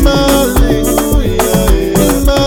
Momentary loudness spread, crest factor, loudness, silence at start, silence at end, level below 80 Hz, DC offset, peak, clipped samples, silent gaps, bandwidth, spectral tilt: 2 LU; 10 dB; -11 LUFS; 0 s; 0 s; -14 dBFS; under 0.1%; 0 dBFS; under 0.1%; none; 19.5 kHz; -5 dB/octave